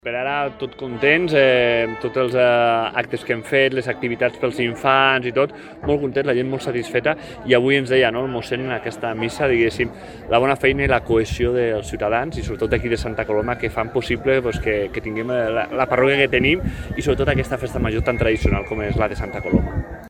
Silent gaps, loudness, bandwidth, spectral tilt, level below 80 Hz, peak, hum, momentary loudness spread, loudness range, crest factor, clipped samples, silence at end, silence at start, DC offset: none; -20 LUFS; 15 kHz; -6 dB/octave; -34 dBFS; 0 dBFS; none; 9 LU; 3 LU; 20 dB; under 0.1%; 0 s; 0.05 s; under 0.1%